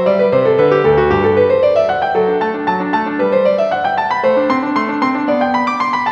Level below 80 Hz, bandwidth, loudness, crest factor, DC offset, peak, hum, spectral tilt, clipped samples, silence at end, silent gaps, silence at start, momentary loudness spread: -42 dBFS; 7 kHz; -14 LUFS; 12 dB; under 0.1%; 0 dBFS; none; -7 dB/octave; under 0.1%; 0 s; none; 0 s; 5 LU